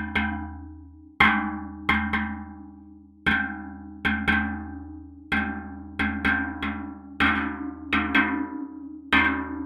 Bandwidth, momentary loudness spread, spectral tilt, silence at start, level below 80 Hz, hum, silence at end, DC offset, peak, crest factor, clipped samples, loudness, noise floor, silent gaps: 15 kHz; 19 LU; -6 dB/octave; 0 s; -46 dBFS; none; 0 s; under 0.1%; -2 dBFS; 26 dB; under 0.1%; -25 LUFS; -48 dBFS; none